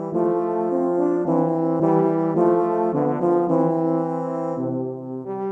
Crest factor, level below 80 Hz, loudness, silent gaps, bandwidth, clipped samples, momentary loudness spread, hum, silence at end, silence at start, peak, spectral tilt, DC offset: 14 dB; -68 dBFS; -21 LUFS; none; 3 kHz; under 0.1%; 7 LU; none; 0 s; 0 s; -6 dBFS; -11 dB/octave; under 0.1%